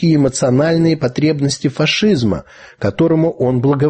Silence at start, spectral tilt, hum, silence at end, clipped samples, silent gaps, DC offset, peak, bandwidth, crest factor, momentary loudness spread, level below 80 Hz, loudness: 0 s; -6 dB/octave; none; 0 s; under 0.1%; none; under 0.1%; -2 dBFS; 8.8 kHz; 12 dB; 6 LU; -44 dBFS; -15 LUFS